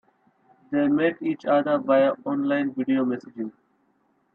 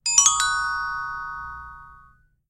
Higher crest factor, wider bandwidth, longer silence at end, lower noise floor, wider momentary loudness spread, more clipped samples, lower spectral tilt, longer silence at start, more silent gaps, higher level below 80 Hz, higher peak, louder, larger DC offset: second, 16 dB vs 22 dB; second, 5.2 kHz vs 16 kHz; first, 0.85 s vs 0.5 s; first, -67 dBFS vs -55 dBFS; second, 11 LU vs 22 LU; neither; first, -8.5 dB/octave vs 3.5 dB/octave; first, 0.7 s vs 0.05 s; neither; second, -74 dBFS vs -50 dBFS; second, -8 dBFS vs -2 dBFS; about the same, -23 LUFS vs -21 LUFS; neither